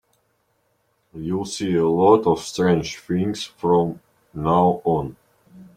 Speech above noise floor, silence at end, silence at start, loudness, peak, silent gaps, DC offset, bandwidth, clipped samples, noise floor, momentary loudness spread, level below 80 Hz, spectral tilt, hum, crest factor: 48 dB; 0.15 s; 1.15 s; -21 LUFS; -2 dBFS; none; under 0.1%; 14 kHz; under 0.1%; -67 dBFS; 12 LU; -52 dBFS; -6.5 dB/octave; none; 20 dB